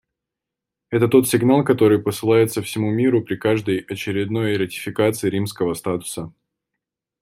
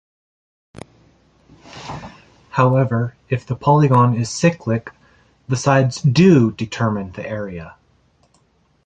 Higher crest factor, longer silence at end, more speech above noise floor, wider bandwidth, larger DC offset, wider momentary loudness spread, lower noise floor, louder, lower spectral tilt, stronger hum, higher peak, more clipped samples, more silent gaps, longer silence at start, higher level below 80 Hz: about the same, 18 dB vs 18 dB; second, 0.9 s vs 1.15 s; first, 66 dB vs 43 dB; first, 16 kHz vs 9.2 kHz; neither; second, 9 LU vs 19 LU; first, -85 dBFS vs -60 dBFS; about the same, -19 LUFS vs -17 LUFS; about the same, -6 dB/octave vs -7 dB/octave; neither; about the same, -2 dBFS vs -2 dBFS; neither; neither; second, 0.9 s vs 1.75 s; second, -58 dBFS vs -50 dBFS